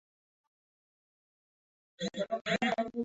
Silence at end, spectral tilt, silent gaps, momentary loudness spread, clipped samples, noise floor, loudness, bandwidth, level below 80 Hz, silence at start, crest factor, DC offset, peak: 0 s; -3 dB/octave; 2.41-2.45 s; 9 LU; under 0.1%; under -90 dBFS; -34 LUFS; 8 kHz; -72 dBFS; 2 s; 20 dB; under 0.1%; -18 dBFS